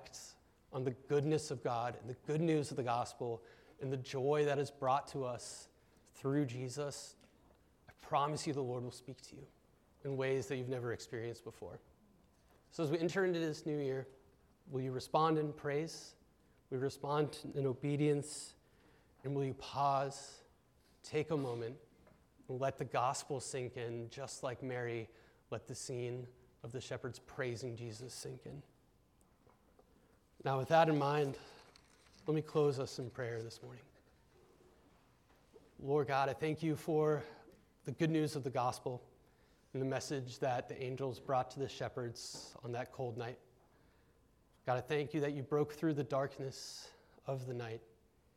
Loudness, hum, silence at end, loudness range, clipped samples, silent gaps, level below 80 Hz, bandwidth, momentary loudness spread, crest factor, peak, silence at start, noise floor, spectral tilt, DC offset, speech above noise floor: -39 LUFS; none; 0.5 s; 7 LU; under 0.1%; none; -74 dBFS; 15.5 kHz; 16 LU; 22 dB; -18 dBFS; 0 s; -71 dBFS; -6 dB/octave; under 0.1%; 32 dB